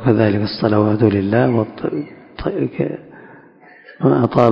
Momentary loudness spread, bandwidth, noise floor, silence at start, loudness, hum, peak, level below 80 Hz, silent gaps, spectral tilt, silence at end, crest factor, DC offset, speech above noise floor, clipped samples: 11 LU; 6 kHz; -45 dBFS; 0 s; -17 LUFS; none; 0 dBFS; -44 dBFS; none; -9.5 dB/octave; 0 s; 16 dB; under 0.1%; 29 dB; 0.1%